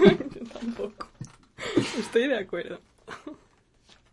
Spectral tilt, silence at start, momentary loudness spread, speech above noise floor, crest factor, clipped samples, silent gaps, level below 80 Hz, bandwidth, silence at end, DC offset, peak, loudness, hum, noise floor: -6 dB/octave; 0 s; 19 LU; 33 dB; 24 dB; under 0.1%; none; -54 dBFS; 11.5 kHz; 0.8 s; under 0.1%; -4 dBFS; -28 LUFS; none; -62 dBFS